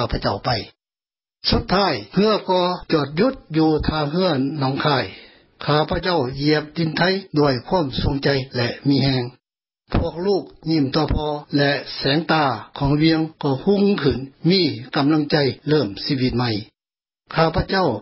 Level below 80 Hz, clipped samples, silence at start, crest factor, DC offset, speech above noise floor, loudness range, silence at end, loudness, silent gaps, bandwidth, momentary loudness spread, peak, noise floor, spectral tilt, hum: -38 dBFS; under 0.1%; 0 s; 16 dB; under 0.1%; over 70 dB; 2 LU; 0 s; -20 LUFS; none; 5.8 kHz; 6 LU; -4 dBFS; under -90 dBFS; -10 dB/octave; none